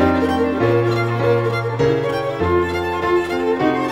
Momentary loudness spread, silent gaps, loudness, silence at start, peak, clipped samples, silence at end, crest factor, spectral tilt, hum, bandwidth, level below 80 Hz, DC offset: 4 LU; none; -18 LUFS; 0 s; -2 dBFS; under 0.1%; 0 s; 14 dB; -7.5 dB/octave; none; 16 kHz; -42 dBFS; under 0.1%